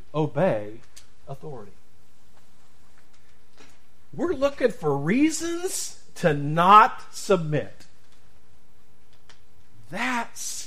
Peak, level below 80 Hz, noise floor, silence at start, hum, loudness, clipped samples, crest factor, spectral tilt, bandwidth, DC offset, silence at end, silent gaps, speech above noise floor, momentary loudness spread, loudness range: -2 dBFS; -56 dBFS; -61 dBFS; 0.15 s; none; -23 LUFS; under 0.1%; 24 dB; -5 dB/octave; 15.5 kHz; 2%; 0 s; none; 37 dB; 25 LU; 12 LU